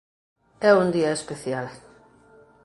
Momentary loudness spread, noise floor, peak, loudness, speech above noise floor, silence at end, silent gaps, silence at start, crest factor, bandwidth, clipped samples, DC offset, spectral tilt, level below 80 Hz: 13 LU; -54 dBFS; -4 dBFS; -23 LUFS; 32 dB; 0.85 s; none; 0.6 s; 22 dB; 11.5 kHz; under 0.1%; under 0.1%; -5.5 dB/octave; -64 dBFS